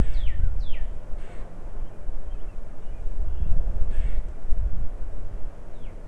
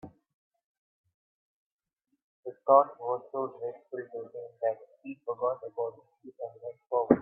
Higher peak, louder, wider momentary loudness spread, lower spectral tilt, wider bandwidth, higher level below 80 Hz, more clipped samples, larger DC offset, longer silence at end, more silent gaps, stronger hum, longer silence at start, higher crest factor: about the same, -6 dBFS vs -6 dBFS; second, -35 LUFS vs -31 LUFS; second, 12 LU vs 20 LU; second, -7.5 dB/octave vs -11.5 dB/octave; first, 3.6 kHz vs 2.9 kHz; first, -26 dBFS vs -74 dBFS; neither; neither; about the same, 0 s vs 0 s; second, none vs 0.34-0.51 s, 0.64-1.04 s, 1.14-1.78 s, 2.23-2.43 s; neither; about the same, 0 s vs 0.05 s; second, 14 dB vs 28 dB